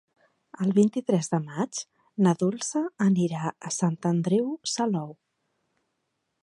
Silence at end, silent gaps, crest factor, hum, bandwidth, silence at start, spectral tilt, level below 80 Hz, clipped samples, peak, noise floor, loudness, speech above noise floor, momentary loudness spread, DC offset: 1.3 s; none; 18 dB; none; 11.5 kHz; 0.6 s; -6 dB/octave; -74 dBFS; under 0.1%; -8 dBFS; -78 dBFS; -26 LUFS; 53 dB; 9 LU; under 0.1%